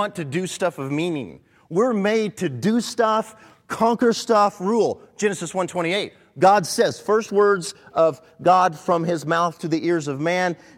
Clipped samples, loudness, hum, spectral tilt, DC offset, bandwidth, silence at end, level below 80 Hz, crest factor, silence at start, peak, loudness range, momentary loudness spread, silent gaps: under 0.1%; -21 LUFS; none; -5 dB/octave; under 0.1%; 16 kHz; 0.2 s; -66 dBFS; 18 dB; 0 s; -4 dBFS; 3 LU; 8 LU; none